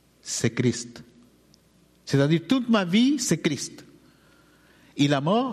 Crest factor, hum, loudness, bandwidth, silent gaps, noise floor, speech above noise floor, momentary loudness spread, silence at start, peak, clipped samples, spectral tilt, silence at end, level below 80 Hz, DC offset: 16 dB; none; -24 LUFS; 13.5 kHz; none; -60 dBFS; 37 dB; 14 LU; 0.25 s; -10 dBFS; under 0.1%; -5 dB/octave; 0 s; -64 dBFS; under 0.1%